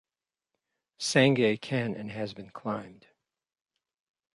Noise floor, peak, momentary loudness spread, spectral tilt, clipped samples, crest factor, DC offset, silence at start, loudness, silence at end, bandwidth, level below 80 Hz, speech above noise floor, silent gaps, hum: under -90 dBFS; -8 dBFS; 15 LU; -5 dB/octave; under 0.1%; 22 dB; under 0.1%; 1 s; -28 LUFS; 1.4 s; 11.5 kHz; -70 dBFS; over 62 dB; none; none